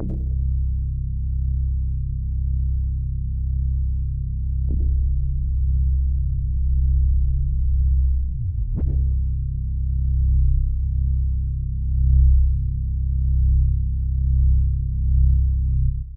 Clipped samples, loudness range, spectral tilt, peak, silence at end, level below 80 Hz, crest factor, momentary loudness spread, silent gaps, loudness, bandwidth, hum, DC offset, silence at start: under 0.1%; 4 LU; -14.5 dB/octave; -6 dBFS; 0 s; -20 dBFS; 14 dB; 7 LU; none; -23 LUFS; 0.6 kHz; none; under 0.1%; 0 s